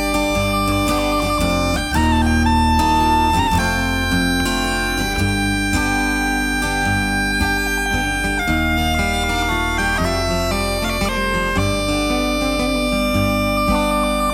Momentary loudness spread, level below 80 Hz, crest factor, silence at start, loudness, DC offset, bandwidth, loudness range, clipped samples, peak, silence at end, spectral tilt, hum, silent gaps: 3 LU; -26 dBFS; 12 dB; 0 s; -18 LUFS; under 0.1%; 17 kHz; 2 LU; under 0.1%; -4 dBFS; 0 s; -4.5 dB/octave; none; none